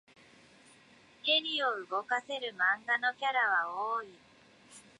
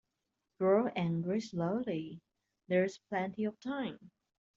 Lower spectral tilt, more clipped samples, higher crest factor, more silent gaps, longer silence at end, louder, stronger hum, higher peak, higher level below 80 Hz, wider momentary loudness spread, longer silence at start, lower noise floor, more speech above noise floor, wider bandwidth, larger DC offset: second, -1.5 dB/octave vs -6.5 dB/octave; neither; about the same, 18 dB vs 18 dB; neither; second, 0.2 s vs 0.5 s; first, -31 LUFS vs -35 LUFS; neither; about the same, -16 dBFS vs -16 dBFS; second, -84 dBFS vs -76 dBFS; second, 8 LU vs 12 LU; first, 1.25 s vs 0.6 s; second, -61 dBFS vs -86 dBFS; second, 28 dB vs 52 dB; first, 11 kHz vs 7.6 kHz; neither